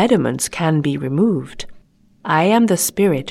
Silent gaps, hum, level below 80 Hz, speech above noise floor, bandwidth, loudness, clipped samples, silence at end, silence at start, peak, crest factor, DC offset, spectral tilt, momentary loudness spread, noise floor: none; none; -48 dBFS; 31 dB; 16 kHz; -17 LUFS; under 0.1%; 0 s; 0 s; -2 dBFS; 14 dB; under 0.1%; -5 dB/octave; 18 LU; -48 dBFS